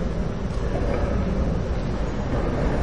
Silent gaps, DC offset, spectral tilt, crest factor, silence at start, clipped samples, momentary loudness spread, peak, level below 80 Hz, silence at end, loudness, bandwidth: none; 2%; -8 dB/octave; 12 dB; 0 s; under 0.1%; 3 LU; -10 dBFS; -28 dBFS; 0 s; -26 LUFS; 9.8 kHz